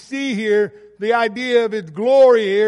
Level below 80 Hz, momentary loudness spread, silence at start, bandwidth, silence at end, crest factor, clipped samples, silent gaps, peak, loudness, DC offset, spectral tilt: -66 dBFS; 11 LU; 0.1 s; 10.5 kHz; 0 s; 14 dB; under 0.1%; none; -4 dBFS; -17 LUFS; under 0.1%; -5 dB/octave